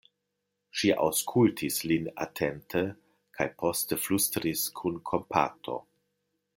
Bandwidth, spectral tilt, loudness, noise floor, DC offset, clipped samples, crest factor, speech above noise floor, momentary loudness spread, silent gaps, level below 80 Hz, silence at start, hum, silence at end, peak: 17 kHz; -4 dB/octave; -29 LUFS; -82 dBFS; under 0.1%; under 0.1%; 22 dB; 53 dB; 10 LU; none; -64 dBFS; 0.75 s; none; 0.75 s; -8 dBFS